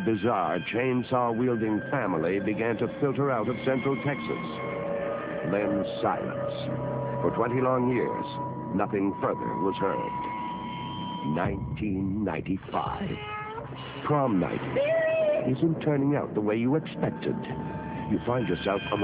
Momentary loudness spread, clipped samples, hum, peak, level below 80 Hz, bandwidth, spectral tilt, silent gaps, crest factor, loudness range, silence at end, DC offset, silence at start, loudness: 8 LU; under 0.1%; none; -12 dBFS; -52 dBFS; 4 kHz; -6 dB/octave; none; 16 dB; 4 LU; 0 s; under 0.1%; 0 s; -28 LUFS